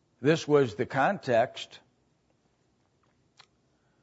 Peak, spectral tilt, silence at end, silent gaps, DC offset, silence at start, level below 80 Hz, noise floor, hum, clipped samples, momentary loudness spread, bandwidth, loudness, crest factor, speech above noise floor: -10 dBFS; -6 dB/octave; 2.25 s; none; under 0.1%; 0.2 s; -74 dBFS; -71 dBFS; none; under 0.1%; 12 LU; 8 kHz; -27 LUFS; 20 dB; 44 dB